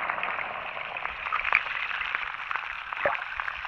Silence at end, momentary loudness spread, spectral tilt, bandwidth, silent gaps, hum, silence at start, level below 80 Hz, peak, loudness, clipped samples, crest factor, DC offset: 0 s; 8 LU; -3 dB/octave; 11.5 kHz; none; none; 0 s; -58 dBFS; -4 dBFS; -29 LUFS; under 0.1%; 26 dB; under 0.1%